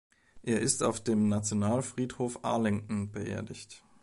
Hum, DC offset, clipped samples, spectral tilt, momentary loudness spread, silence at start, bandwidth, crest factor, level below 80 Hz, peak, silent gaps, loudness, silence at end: none; under 0.1%; under 0.1%; -5 dB/octave; 13 LU; 0.35 s; 11.5 kHz; 18 dB; -58 dBFS; -14 dBFS; none; -31 LUFS; 0.25 s